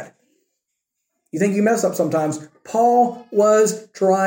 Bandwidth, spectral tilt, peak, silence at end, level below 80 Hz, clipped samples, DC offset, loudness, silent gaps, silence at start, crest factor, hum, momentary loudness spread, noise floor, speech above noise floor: 17 kHz; -5.5 dB/octave; -4 dBFS; 0 s; -72 dBFS; under 0.1%; under 0.1%; -18 LUFS; none; 0 s; 14 dB; none; 10 LU; -78 dBFS; 61 dB